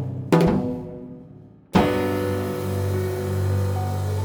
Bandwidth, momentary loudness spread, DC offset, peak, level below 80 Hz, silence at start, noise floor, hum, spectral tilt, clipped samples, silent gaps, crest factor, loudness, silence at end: over 20 kHz; 15 LU; under 0.1%; -4 dBFS; -46 dBFS; 0 s; -46 dBFS; none; -7.5 dB/octave; under 0.1%; none; 18 dB; -23 LUFS; 0 s